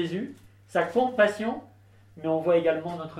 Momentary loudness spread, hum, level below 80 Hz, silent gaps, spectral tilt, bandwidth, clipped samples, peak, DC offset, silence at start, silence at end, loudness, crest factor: 12 LU; none; -66 dBFS; none; -6.5 dB/octave; 12.5 kHz; under 0.1%; -10 dBFS; under 0.1%; 0 s; 0 s; -26 LUFS; 18 dB